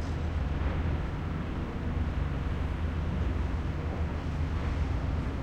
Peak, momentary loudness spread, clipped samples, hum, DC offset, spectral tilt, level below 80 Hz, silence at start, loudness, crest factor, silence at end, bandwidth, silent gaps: -18 dBFS; 3 LU; under 0.1%; none; under 0.1%; -8 dB/octave; -34 dBFS; 0 s; -33 LUFS; 12 dB; 0 s; 7.8 kHz; none